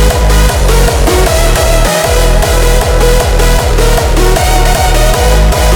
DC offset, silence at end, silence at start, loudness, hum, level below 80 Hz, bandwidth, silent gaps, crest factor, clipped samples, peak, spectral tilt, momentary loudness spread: under 0.1%; 0 s; 0 s; -9 LUFS; none; -8 dBFS; 19 kHz; none; 6 dB; 0.4%; 0 dBFS; -4 dB/octave; 1 LU